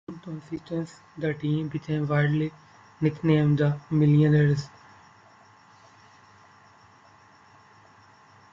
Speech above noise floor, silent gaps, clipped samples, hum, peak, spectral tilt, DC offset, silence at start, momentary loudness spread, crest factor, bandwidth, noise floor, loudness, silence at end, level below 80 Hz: 31 dB; none; under 0.1%; none; -10 dBFS; -8.5 dB/octave; under 0.1%; 0.1 s; 17 LU; 18 dB; 7.4 kHz; -55 dBFS; -25 LUFS; 3.85 s; -60 dBFS